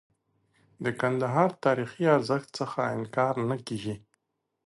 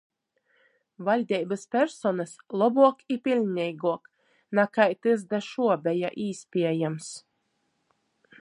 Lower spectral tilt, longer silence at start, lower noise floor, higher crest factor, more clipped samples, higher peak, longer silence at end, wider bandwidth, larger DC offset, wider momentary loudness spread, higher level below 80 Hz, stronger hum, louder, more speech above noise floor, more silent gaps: about the same, -6.5 dB/octave vs -6 dB/octave; second, 0.8 s vs 1 s; about the same, -76 dBFS vs -75 dBFS; about the same, 20 dB vs 22 dB; neither; about the same, -8 dBFS vs -6 dBFS; second, 0.7 s vs 1.2 s; about the same, 11.5 kHz vs 11 kHz; neither; about the same, 10 LU vs 11 LU; first, -68 dBFS vs -80 dBFS; neither; about the same, -28 LUFS vs -26 LUFS; about the same, 49 dB vs 49 dB; neither